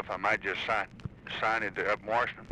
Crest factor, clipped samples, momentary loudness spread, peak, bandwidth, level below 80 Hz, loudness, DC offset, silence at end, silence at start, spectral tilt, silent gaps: 18 dB; under 0.1%; 9 LU; -14 dBFS; 11 kHz; -58 dBFS; -31 LUFS; under 0.1%; 0 s; 0 s; -4.5 dB/octave; none